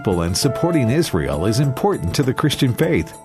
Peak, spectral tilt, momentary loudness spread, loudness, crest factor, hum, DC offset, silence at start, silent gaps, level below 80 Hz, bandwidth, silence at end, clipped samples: -4 dBFS; -5.5 dB/octave; 3 LU; -18 LUFS; 14 dB; none; under 0.1%; 0 s; none; -38 dBFS; 14 kHz; 0 s; under 0.1%